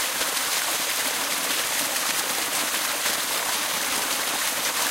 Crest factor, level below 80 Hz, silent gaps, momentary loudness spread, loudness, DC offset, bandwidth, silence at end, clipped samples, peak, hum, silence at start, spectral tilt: 16 dB; -62 dBFS; none; 1 LU; -23 LUFS; under 0.1%; 16 kHz; 0 s; under 0.1%; -10 dBFS; none; 0 s; 1 dB/octave